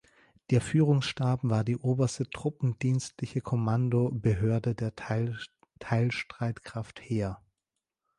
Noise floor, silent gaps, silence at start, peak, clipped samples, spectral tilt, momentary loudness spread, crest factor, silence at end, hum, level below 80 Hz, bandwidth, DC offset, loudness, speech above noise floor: -87 dBFS; none; 0.5 s; -12 dBFS; under 0.1%; -7 dB/octave; 10 LU; 18 dB; 0.8 s; none; -54 dBFS; 11 kHz; under 0.1%; -30 LUFS; 59 dB